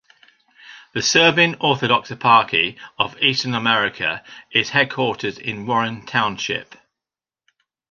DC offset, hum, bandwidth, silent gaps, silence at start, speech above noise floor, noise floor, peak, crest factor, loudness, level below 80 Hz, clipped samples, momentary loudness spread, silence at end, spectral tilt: under 0.1%; none; 7.4 kHz; none; 0.65 s; 70 dB; -89 dBFS; -2 dBFS; 20 dB; -18 LUFS; -60 dBFS; under 0.1%; 11 LU; 1.3 s; -3 dB/octave